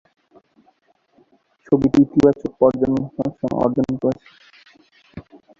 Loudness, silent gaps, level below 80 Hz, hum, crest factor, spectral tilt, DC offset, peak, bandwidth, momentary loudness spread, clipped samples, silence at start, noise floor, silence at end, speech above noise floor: -19 LUFS; none; -50 dBFS; none; 20 dB; -9 dB/octave; under 0.1%; -2 dBFS; 7.4 kHz; 25 LU; under 0.1%; 1.7 s; -60 dBFS; 0.4 s; 43 dB